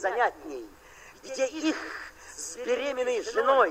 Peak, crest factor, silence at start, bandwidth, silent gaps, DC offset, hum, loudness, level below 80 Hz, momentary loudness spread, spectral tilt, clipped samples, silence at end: -10 dBFS; 18 dB; 0 s; 16 kHz; none; under 0.1%; none; -29 LUFS; -62 dBFS; 19 LU; -2 dB/octave; under 0.1%; 0 s